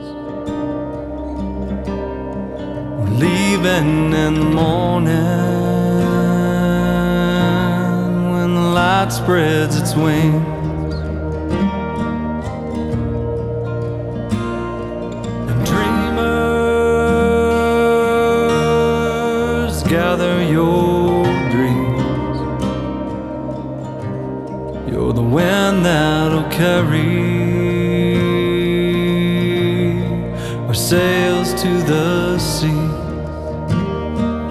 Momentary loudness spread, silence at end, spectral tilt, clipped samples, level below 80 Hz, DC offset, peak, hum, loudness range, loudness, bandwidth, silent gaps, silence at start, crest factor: 10 LU; 0 s; -6.5 dB/octave; under 0.1%; -32 dBFS; under 0.1%; 0 dBFS; none; 6 LU; -17 LUFS; 14.5 kHz; none; 0 s; 16 dB